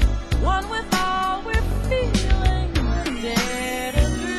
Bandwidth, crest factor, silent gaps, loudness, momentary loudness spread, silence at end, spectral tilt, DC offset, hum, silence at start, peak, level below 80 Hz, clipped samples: 13.5 kHz; 16 dB; none; -23 LUFS; 3 LU; 0 s; -5 dB/octave; under 0.1%; none; 0 s; -6 dBFS; -24 dBFS; under 0.1%